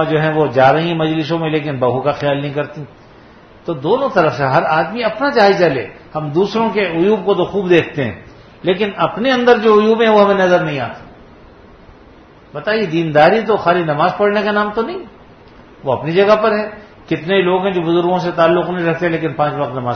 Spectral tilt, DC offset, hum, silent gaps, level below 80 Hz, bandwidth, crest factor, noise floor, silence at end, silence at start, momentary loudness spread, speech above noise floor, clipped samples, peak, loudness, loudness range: -7 dB/octave; under 0.1%; none; none; -50 dBFS; 6.6 kHz; 16 dB; -42 dBFS; 0 s; 0 s; 12 LU; 28 dB; under 0.1%; 0 dBFS; -15 LUFS; 4 LU